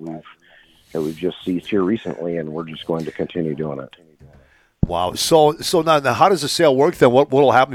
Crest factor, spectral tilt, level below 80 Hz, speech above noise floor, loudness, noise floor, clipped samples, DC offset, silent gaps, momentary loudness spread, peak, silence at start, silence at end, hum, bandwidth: 18 dB; -5 dB/octave; -44 dBFS; 34 dB; -18 LUFS; -52 dBFS; under 0.1%; under 0.1%; none; 14 LU; -2 dBFS; 0 s; 0 s; none; 18 kHz